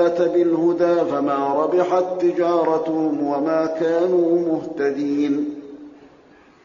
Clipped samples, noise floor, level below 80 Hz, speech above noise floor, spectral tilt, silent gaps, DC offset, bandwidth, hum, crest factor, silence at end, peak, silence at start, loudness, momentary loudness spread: under 0.1%; -50 dBFS; -64 dBFS; 31 dB; -6 dB/octave; none; under 0.1%; 7.2 kHz; none; 14 dB; 0.75 s; -6 dBFS; 0 s; -20 LUFS; 5 LU